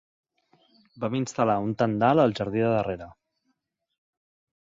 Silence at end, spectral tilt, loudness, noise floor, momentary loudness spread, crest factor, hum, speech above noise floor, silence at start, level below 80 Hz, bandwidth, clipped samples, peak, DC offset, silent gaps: 1.55 s; -6.5 dB/octave; -25 LUFS; -77 dBFS; 11 LU; 20 dB; none; 52 dB; 0.95 s; -60 dBFS; 7.8 kHz; under 0.1%; -8 dBFS; under 0.1%; none